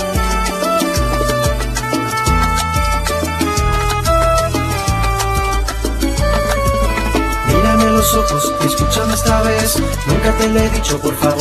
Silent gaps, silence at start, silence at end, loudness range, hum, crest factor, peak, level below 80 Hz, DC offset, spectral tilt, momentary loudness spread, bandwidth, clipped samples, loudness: none; 0 s; 0 s; 2 LU; none; 14 dB; 0 dBFS; -20 dBFS; under 0.1%; -4.5 dB/octave; 4 LU; 14 kHz; under 0.1%; -15 LUFS